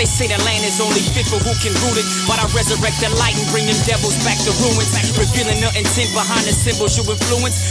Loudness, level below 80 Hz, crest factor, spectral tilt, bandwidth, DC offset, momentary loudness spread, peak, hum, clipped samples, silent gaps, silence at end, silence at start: -15 LUFS; -30 dBFS; 14 dB; -3.5 dB/octave; 11 kHz; under 0.1%; 2 LU; -2 dBFS; none; under 0.1%; none; 0 s; 0 s